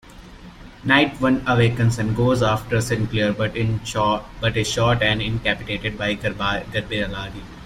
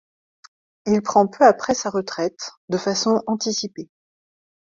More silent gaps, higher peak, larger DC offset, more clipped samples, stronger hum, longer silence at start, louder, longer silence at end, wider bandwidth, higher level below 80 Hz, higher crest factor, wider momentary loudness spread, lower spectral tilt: second, none vs 2.57-2.68 s; about the same, -2 dBFS vs -2 dBFS; neither; neither; neither; second, 0.05 s vs 0.85 s; about the same, -21 LUFS vs -20 LUFS; second, 0 s vs 0.95 s; first, 15 kHz vs 7.8 kHz; first, -40 dBFS vs -62 dBFS; about the same, 20 dB vs 20 dB; second, 8 LU vs 15 LU; first, -5.5 dB/octave vs -4 dB/octave